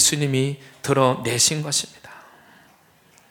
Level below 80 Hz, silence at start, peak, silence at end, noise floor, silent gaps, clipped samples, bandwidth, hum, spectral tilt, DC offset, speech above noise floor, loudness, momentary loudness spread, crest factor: -62 dBFS; 0 s; -4 dBFS; 1.15 s; -55 dBFS; none; under 0.1%; 19 kHz; none; -3 dB/octave; under 0.1%; 34 dB; -20 LUFS; 10 LU; 20 dB